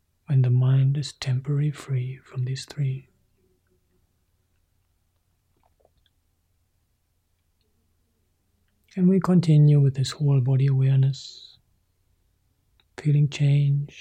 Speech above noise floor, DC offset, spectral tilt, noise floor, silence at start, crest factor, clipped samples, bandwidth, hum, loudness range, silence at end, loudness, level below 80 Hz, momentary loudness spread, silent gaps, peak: 49 dB; under 0.1%; -8 dB/octave; -71 dBFS; 0.3 s; 14 dB; under 0.1%; 9.4 kHz; none; 14 LU; 0 s; -22 LUFS; -64 dBFS; 12 LU; none; -10 dBFS